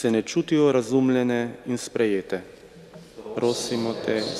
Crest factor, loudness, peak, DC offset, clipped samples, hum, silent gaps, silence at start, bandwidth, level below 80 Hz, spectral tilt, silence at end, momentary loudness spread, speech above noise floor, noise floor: 16 dB; -24 LUFS; -8 dBFS; under 0.1%; under 0.1%; none; none; 0 s; 14 kHz; -62 dBFS; -5 dB/octave; 0 s; 13 LU; 22 dB; -46 dBFS